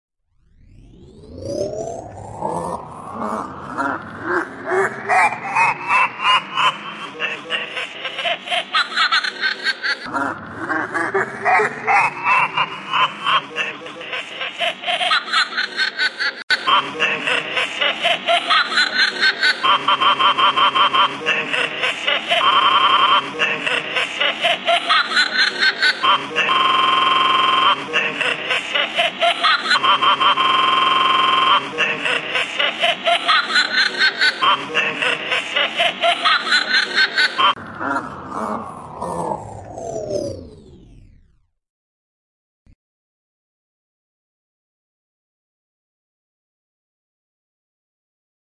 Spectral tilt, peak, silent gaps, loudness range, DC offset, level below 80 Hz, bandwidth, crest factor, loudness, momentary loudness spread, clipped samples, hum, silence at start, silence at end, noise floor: -2 dB/octave; -4 dBFS; 16.43-16.48 s; 11 LU; under 0.1%; -58 dBFS; 11.5 kHz; 16 dB; -17 LUFS; 12 LU; under 0.1%; none; 1 s; 7.5 s; -57 dBFS